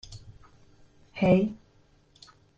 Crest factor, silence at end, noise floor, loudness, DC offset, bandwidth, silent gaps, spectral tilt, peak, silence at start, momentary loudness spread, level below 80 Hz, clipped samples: 22 dB; 1 s; -62 dBFS; -25 LUFS; under 0.1%; 7.8 kHz; none; -8 dB/octave; -10 dBFS; 0.1 s; 26 LU; -56 dBFS; under 0.1%